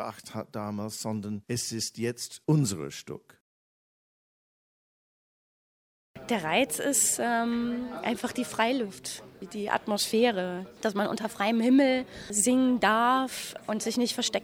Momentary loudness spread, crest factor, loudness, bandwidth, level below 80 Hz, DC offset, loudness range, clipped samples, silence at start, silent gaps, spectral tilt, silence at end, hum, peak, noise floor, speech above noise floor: 14 LU; 20 dB; -28 LUFS; 17 kHz; -66 dBFS; under 0.1%; 9 LU; under 0.1%; 0 s; 3.41-6.14 s; -3.5 dB/octave; 0 s; none; -8 dBFS; under -90 dBFS; over 62 dB